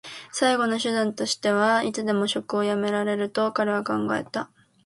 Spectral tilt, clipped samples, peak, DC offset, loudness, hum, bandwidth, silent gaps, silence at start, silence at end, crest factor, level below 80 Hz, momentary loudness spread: -4 dB/octave; under 0.1%; -8 dBFS; under 0.1%; -24 LUFS; none; 11.5 kHz; none; 0.05 s; 0.4 s; 18 dB; -70 dBFS; 6 LU